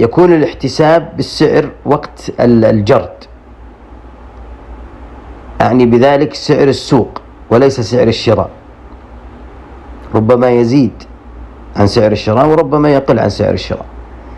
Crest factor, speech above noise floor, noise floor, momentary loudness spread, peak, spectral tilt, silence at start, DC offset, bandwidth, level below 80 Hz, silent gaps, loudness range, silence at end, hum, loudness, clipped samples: 12 dB; 25 dB; -34 dBFS; 16 LU; 0 dBFS; -7 dB/octave; 0 s; under 0.1%; 11 kHz; -34 dBFS; none; 4 LU; 0 s; none; -11 LUFS; 0.5%